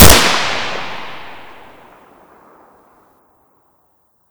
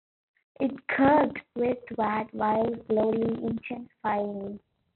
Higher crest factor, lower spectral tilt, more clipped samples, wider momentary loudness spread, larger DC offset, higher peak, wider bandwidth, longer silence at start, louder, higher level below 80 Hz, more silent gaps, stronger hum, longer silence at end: about the same, 16 dB vs 18 dB; second, -3 dB/octave vs -5.5 dB/octave; first, 2% vs under 0.1%; first, 28 LU vs 13 LU; neither; first, 0 dBFS vs -10 dBFS; first, over 20 kHz vs 4.3 kHz; second, 0 s vs 0.6 s; first, -13 LUFS vs -28 LUFS; first, -28 dBFS vs -62 dBFS; neither; neither; second, 0 s vs 0.4 s